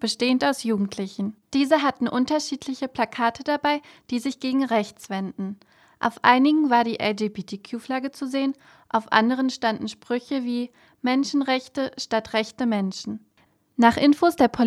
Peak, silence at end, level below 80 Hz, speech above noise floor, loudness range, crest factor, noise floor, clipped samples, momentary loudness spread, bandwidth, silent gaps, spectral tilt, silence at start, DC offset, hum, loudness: -2 dBFS; 0 s; -62 dBFS; 39 dB; 3 LU; 22 dB; -62 dBFS; under 0.1%; 13 LU; 13 kHz; none; -4.5 dB/octave; 0 s; under 0.1%; none; -23 LUFS